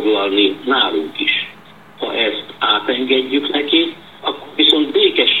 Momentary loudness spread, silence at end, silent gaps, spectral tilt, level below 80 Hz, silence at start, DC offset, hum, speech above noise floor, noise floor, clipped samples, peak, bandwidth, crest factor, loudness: 11 LU; 0 s; none; -4 dB/octave; -64 dBFS; 0 s; 0.4%; none; 25 dB; -42 dBFS; under 0.1%; 0 dBFS; 14.5 kHz; 16 dB; -15 LUFS